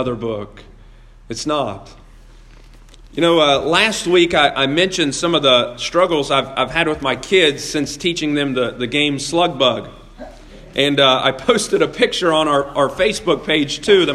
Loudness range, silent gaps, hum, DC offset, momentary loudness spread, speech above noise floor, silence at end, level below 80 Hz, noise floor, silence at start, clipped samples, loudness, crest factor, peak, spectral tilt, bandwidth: 4 LU; none; none; under 0.1%; 10 LU; 26 dB; 0 s; -44 dBFS; -42 dBFS; 0 s; under 0.1%; -16 LUFS; 18 dB; 0 dBFS; -3.5 dB/octave; 13 kHz